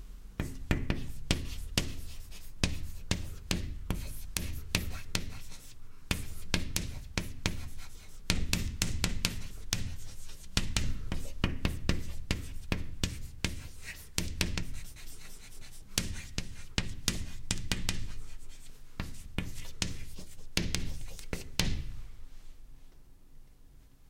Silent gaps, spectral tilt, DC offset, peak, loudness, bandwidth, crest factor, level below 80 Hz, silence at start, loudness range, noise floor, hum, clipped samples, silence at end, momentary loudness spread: none; -3.5 dB/octave; under 0.1%; -4 dBFS; -36 LUFS; 16.5 kHz; 30 dB; -40 dBFS; 0 s; 4 LU; -55 dBFS; none; under 0.1%; 0 s; 16 LU